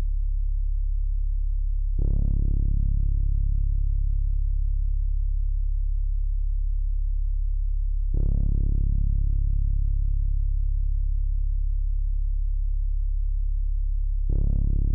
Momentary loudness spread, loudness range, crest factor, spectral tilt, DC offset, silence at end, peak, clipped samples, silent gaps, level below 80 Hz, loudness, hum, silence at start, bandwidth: 4 LU; 2 LU; 8 dB; -18 dB/octave; under 0.1%; 0 s; -14 dBFS; under 0.1%; none; -22 dBFS; -29 LUFS; none; 0 s; 0.7 kHz